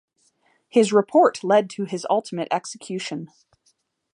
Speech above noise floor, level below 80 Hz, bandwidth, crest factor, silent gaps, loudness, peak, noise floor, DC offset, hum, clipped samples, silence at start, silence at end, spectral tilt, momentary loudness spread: 46 dB; -76 dBFS; 11 kHz; 20 dB; none; -22 LUFS; -4 dBFS; -67 dBFS; under 0.1%; none; under 0.1%; 0.75 s; 0.85 s; -5 dB/octave; 13 LU